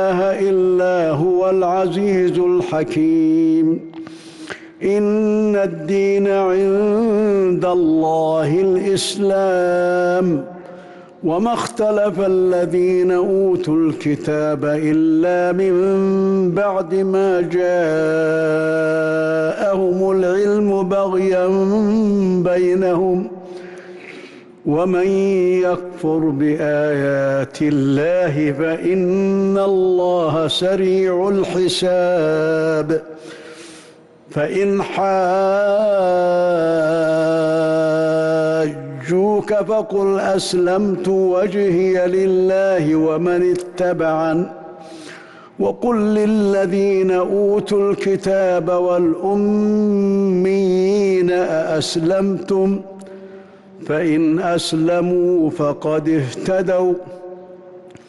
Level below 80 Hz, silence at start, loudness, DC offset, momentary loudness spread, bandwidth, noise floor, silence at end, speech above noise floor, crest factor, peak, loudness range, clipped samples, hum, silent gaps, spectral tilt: -54 dBFS; 0 s; -17 LUFS; under 0.1%; 7 LU; 12 kHz; -44 dBFS; 0.15 s; 28 dB; 8 dB; -8 dBFS; 3 LU; under 0.1%; none; none; -6.5 dB/octave